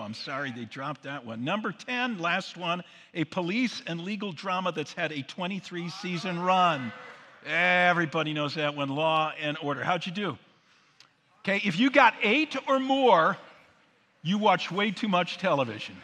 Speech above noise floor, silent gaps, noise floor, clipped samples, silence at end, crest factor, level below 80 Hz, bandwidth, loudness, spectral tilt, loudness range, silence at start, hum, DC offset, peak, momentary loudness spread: 37 dB; none; -64 dBFS; under 0.1%; 0 s; 24 dB; -80 dBFS; 10.5 kHz; -27 LUFS; -5 dB/octave; 7 LU; 0 s; none; under 0.1%; -4 dBFS; 14 LU